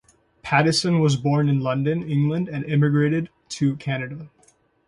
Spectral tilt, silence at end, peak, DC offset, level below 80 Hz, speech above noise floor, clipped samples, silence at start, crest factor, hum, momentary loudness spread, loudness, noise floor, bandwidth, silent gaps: -6 dB/octave; 0.6 s; -4 dBFS; under 0.1%; -58 dBFS; 39 dB; under 0.1%; 0.45 s; 18 dB; none; 10 LU; -22 LUFS; -60 dBFS; 11.5 kHz; none